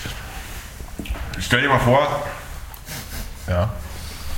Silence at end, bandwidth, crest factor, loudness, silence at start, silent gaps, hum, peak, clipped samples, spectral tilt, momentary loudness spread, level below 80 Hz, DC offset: 0 s; 17 kHz; 22 dB; -22 LUFS; 0 s; none; none; -2 dBFS; under 0.1%; -5 dB/octave; 18 LU; -34 dBFS; under 0.1%